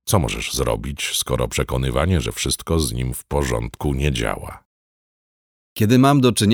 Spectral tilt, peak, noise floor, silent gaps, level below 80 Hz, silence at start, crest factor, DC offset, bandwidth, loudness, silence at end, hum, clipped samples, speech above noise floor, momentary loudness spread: -5 dB/octave; -2 dBFS; under -90 dBFS; 4.65-5.76 s; -32 dBFS; 0.05 s; 18 dB; under 0.1%; over 20 kHz; -20 LUFS; 0 s; none; under 0.1%; over 71 dB; 10 LU